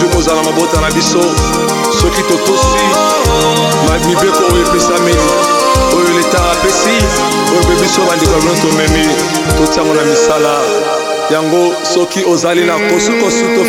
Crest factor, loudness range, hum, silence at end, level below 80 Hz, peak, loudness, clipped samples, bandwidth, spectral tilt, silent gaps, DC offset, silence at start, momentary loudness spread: 10 dB; 1 LU; none; 0 s; -24 dBFS; 0 dBFS; -10 LUFS; under 0.1%; 17.5 kHz; -4 dB/octave; none; under 0.1%; 0 s; 2 LU